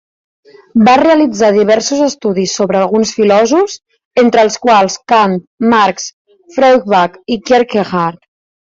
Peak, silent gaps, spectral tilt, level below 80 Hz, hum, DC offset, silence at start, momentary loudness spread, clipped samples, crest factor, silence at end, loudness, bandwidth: 0 dBFS; 4.05-4.11 s, 5.47-5.58 s, 6.13-6.25 s; -4.5 dB/octave; -52 dBFS; none; under 0.1%; 0.75 s; 9 LU; under 0.1%; 12 dB; 0.5 s; -11 LUFS; 7.8 kHz